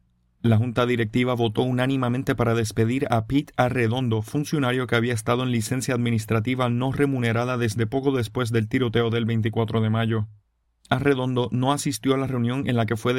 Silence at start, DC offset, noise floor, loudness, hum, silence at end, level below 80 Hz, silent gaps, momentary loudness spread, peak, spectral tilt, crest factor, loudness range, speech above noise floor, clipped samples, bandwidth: 0.45 s; under 0.1%; -61 dBFS; -23 LUFS; none; 0 s; -52 dBFS; none; 3 LU; -6 dBFS; -6.5 dB/octave; 18 dB; 1 LU; 39 dB; under 0.1%; 16 kHz